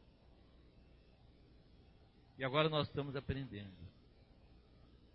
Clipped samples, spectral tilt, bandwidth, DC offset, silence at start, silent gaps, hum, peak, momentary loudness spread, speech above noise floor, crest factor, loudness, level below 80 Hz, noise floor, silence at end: under 0.1%; -4 dB/octave; 5.6 kHz; under 0.1%; 0.55 s; none; none; -18 dBFS; 24 LU; 26 dB; 26 dB; -39 LUFS; -62 dBFS; -65 dBFS; 0.2 s